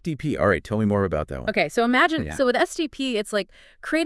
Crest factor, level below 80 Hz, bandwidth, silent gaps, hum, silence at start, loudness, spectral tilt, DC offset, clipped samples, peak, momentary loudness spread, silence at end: 18 dB; -46 dBFS; 12 kHz; none; none; 0.05 s; -23 LUFS; -5.5 dB/octave; under 0.1%; under 0.1%; -6 dBFS; 8 LU; 0 s